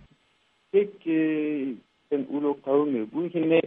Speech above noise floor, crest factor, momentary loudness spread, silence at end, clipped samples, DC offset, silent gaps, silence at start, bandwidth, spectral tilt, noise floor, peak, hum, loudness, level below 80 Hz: 42 dB; 18 dB; 7 LU; 0 s; under 0.1%; under 0.1%; none; 0.75 s; 3.8 kHz; -9.5 dB/octave; -67 dBFS; -8 dBFS; none; -27 LUFS; -74 dBFS